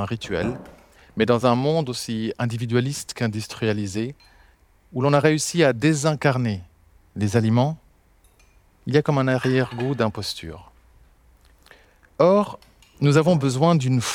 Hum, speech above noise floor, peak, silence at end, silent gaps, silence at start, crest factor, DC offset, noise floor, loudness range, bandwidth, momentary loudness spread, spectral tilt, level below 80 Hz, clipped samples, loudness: none; 36 dB; -2 dBFS; 0 s; none; 0 s; 22 dB; under 0.1%; -57 dBFS; 4 LU; 16.5 kHz; 13 LU; -6 dB/octave; -54 dBFS; under 0.1%; -22 LUFS